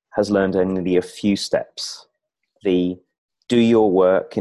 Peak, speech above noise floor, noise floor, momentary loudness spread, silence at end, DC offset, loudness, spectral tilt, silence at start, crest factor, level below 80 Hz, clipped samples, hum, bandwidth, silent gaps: -4 dBFS; 53 dB; -71 dBFS; 14 LU; 0 s; under 0.1%; -19 LUFS; -6 dB/octave; 0.15 s; 16 dB; -52 dBFS; under 0.1%; none; 12 kHz; 3.18-3.29 s